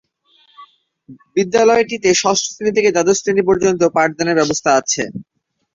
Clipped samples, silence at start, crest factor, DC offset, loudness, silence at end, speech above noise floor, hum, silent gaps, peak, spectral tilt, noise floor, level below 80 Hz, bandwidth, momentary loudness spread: under 0.1%; 0.6 s; 16 dB; under 0.1%; -15 LUFS; 0.55 s; 41 dB; none; none; -2 dBFS; -3.5 dB/octave; -56 dBFS; -54 dBFS; 7.8 kHz; 7 LU